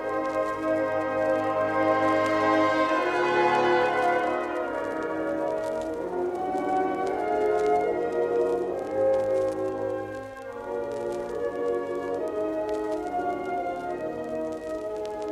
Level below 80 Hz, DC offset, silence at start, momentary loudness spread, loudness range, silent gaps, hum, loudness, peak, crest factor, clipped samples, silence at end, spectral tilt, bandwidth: -58 dBFS; under 0.1%; 0 s; 9 LU; 7 LU; none; none; -27 LUFS; -10 dBFS; 16 dB; under 0.1%; 0 s; -5.5 dB/octave; 13.5 kHz